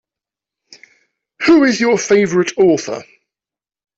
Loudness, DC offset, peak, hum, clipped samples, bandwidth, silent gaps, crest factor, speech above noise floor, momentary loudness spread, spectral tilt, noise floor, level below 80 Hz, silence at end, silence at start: -13 LUFS; under 0.1%; -2 dBFS; none; under 0.1%; 8 kHz; none; 14 dB; 77 dB; 10 LU; -4.5 dB/octave; -90 dBFS; -58 dBFS; 0.95 s; 1.4 s